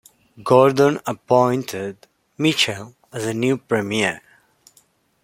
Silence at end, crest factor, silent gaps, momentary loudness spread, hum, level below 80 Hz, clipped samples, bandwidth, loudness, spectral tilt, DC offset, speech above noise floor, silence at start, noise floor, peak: 1.05 s; 18 dB; none; 17 LU; none; -62 dBFS; under 0.1%; 16.5 kHz; -19 LUFS; -5 dB/octave; under 0.1%; 40 dB; 0.4 s; -59 dBFS; -2 dBFS